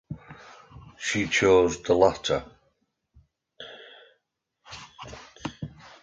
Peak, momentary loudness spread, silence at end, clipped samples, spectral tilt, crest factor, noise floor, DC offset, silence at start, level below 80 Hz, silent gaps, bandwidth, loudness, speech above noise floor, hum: -6 dBFS; 25 LU; 0.35 s; under 0.1%; -4 dB/octave; 22 dB; -77 dBFS; under 0.1%; 0.1 s; -52 dBFS; none; 9 kHz; -24 LUFS; 55 dB; none